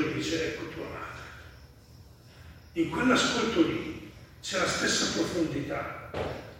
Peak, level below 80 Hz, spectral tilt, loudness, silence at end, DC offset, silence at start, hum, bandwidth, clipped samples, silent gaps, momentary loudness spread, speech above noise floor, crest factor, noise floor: -10 dBFS; -54 dBFS; -3.5 dB/octave; -29 LUFS; 0 s; under 0.1%; 0 s; none; 16.5 kHz; under 0.1%; none; 16 LU; 24 dB; 20 dB; -52 dBFS